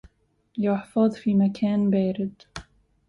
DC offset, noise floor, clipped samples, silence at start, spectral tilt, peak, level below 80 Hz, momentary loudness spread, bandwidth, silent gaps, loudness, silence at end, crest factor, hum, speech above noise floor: under 0.1%; -64 dBFS; under 0.1%; 0.55 s; -8.5 dB/octave; -10 dBFS; -58 dBFS; 18 LU; 10.5 kHz; none; -24 LUFS; 0.45 s; 14 dB; none; 42 dB